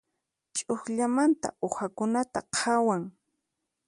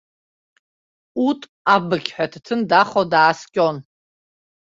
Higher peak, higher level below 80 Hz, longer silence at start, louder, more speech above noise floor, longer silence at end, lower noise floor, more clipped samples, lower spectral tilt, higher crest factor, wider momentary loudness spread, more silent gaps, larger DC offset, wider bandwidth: second, -12 dBFS vs -2 dBFS; about the same, -68 dBFS vs -64 dBFS; second, 0.55 s vs 1.15 s; second, -28 LUFS vs -19 LUFS; second, 55 dB vs over 72 dB; about the same, 0.75 s vs 0.85 s; second, -83 dBFS vs under -90 dBFS; neither; second, -4 dB/octave vs -5.5 dB/octave; about the same, 16 dB vs 20 dB; about the same, 9 LU vs 9 LU; second, none vs 1.49-1.65 s; neither; first, 11.5 kHz vs 7.8 kHz